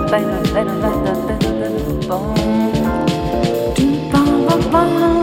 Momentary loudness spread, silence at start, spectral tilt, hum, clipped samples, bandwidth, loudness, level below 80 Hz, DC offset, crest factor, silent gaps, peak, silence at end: 5 LU; 0 s; -6.5 dB/octave; none; under 0.1%; 17.5 kHz; -16 LUFS; -30 dBFS; under 0.1%; 14 dB; none; 0 dBFS; 0 s